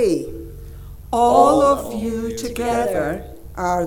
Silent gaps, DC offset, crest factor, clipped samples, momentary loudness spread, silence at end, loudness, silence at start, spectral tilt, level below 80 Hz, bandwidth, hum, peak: none; under 0.1%; 20 dB; under 0.1%; 23 LU; 0 s; -19 LUFS; 0 s; -5.5 dB/octave; -38 dBFS; 18 kHz; none; 0 dBFS